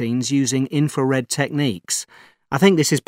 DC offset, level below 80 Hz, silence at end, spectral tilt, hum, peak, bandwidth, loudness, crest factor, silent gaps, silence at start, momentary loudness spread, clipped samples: under 0.1%; -66 dBFS; 0.05 s; -4.5 dB/octave; none; -2 dBFS; 16 kHz; -20 LUFS; 18 dB; none; 0 s; 9 LU; under 0.1%